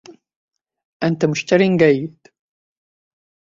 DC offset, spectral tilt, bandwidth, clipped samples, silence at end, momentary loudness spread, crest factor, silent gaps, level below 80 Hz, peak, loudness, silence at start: under 0.1%; -6.5 dB/octave; 7.6 kHz; under 0.1%; 1.4 s; 10 LU; 18 dB; 0.36-0.48 s, 0.85-1.00 s; -60 dBFS; -2 dBFS; -17 LUFS; 0.1 s